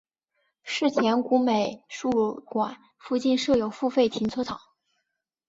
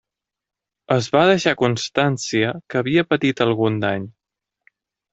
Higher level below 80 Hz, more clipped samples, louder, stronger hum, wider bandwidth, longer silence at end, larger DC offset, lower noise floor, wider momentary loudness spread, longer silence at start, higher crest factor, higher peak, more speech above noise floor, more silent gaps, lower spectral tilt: about the same, -62 dBFS vs -60 dBFS; neither; second, -26 LUFS vs -19 LUFS; neither; about the same, 7.8 kHz vs 8.2 kHz; about the same, 0.9 s vs 1 s; neither; second, -80 dBFS vs -86 dBFS; about the same, 10 LU vs 8 LU; second, 0.65 s vs 0.9 s; about the same, 16 dB vs 18 dB; second, -10 dBFS vs -2 dBFS; second, 55 dB vs 68 dB; neither; about the same, -5 dB/octave vs -5.5 dB/octave